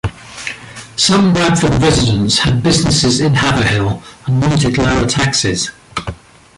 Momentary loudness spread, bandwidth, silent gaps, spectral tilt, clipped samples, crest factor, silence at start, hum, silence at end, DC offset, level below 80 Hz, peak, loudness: 14 LU; 11.5 kHz; none; -4.5 dB/octave; under 0.1%; 12 dB; 0.05 s; none; 0.4 s; under 0.1%; -32 dBFS; 0 dBFS; -13 LUFS